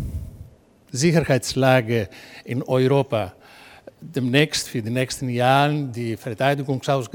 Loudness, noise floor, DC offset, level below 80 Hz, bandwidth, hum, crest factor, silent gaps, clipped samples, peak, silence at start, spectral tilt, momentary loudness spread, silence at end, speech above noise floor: -21 LUFS; -49 dBFS; under 0.1%; -46 dBFS; 18 kHz; none; 20 dB; none; under 0.1%; -2 dBFS; 0 s; -5.5 dB/octave; 14 LU; 0.1 s; 28 dB